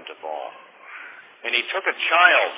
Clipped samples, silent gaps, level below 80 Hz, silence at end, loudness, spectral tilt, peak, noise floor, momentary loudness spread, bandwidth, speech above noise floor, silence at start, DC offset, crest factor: under 0.1%; none; under -90 dBFS; 0 s; -18 LUFS; -3 dB/octave; -2 dBFS; -42 dBFS; 24 LU; 4 kHz; 23 dB; 0 s; under 0.1%; 20 dB